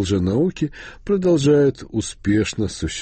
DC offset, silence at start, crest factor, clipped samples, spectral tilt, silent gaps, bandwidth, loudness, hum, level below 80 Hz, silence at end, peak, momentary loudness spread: under 0.1%; 0 s; 14 dB; under 0.1%; -6 dB/octave; none; 8.8 kHz; -20 LUFS; none; -40 dBFS; 0 s; -6 dBFS; 11 LU